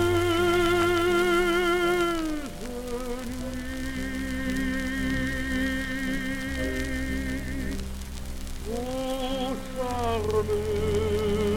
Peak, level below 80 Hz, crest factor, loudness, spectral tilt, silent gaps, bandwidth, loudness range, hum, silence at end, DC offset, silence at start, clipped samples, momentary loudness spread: -12 dBFS; -36 dBFS; 14 dB; -27 LUFS; -5 dB/octave; none; 17 kHz; 7 LU; none; 0 s; under 0.1%; 0 s; under 0.1%; 11 LU